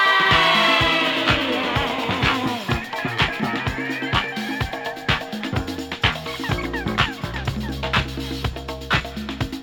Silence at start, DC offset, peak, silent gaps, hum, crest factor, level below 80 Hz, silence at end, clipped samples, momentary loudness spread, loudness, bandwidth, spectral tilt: 0 s; under 0.1%; -4 dBFS; none; none; 20 dB; -36 dBFS; 0 s; under 0.1%; 12 LU; -21 LUFS; over 20 kHz; -4.5 dB/octave